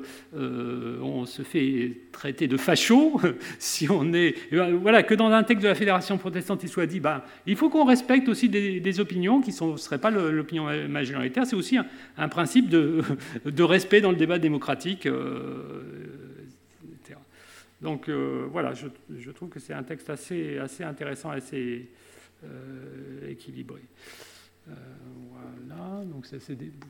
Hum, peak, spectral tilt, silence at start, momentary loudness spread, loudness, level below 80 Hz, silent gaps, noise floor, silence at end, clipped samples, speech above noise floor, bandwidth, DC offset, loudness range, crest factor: none; 0 dBFS; -5 dB/octave; 0 s; 22 LU; -25 LUFS; -74 dBFS; none; -53 dBFS; 0 s; under 0.1%; 27 dB; 18.5 kHz; under 0.1%; 18 LU; 26 dB